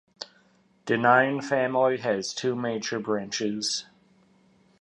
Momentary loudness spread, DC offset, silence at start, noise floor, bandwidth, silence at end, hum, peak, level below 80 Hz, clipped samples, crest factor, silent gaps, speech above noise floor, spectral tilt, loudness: 17 LU; under 0.1%; 0.2 s; -62 dBFS; 11.5 kHz; 1 s; none; -6 dBFS; -72 dBFS; under 0.1%; 22 dB; none; 37 dB; -4 dB/octave; -25 LUFS